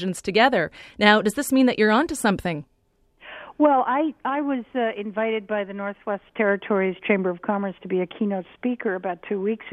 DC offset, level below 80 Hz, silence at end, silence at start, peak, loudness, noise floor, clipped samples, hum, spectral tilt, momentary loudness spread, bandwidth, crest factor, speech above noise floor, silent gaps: under 0.1%; -58 dBFS; 0 s; 0 s; 0 dBFS; -23 LUFS; -63 dBFS; under 0.1%; none; -5 dB/octave; 11 LU; 14 kHz; 22 dB; 41 dB; none